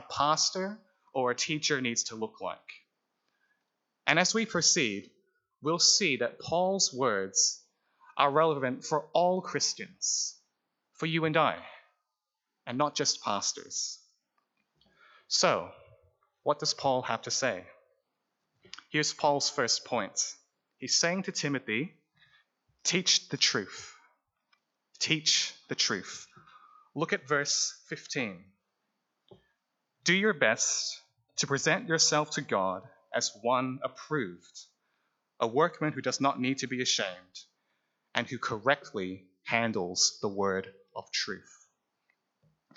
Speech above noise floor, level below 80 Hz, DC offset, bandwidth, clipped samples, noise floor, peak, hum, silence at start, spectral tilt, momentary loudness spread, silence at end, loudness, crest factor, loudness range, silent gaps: 57 dB; -78 dBFS; under 0.1%; 8.4 kHz; under 0.1%; -87 dBFS; -8 dBFS; none; 0 s; -2 dB/octave; 15 LU; 1.35 s; -29 LUFS; 24 dB; 6 LU; none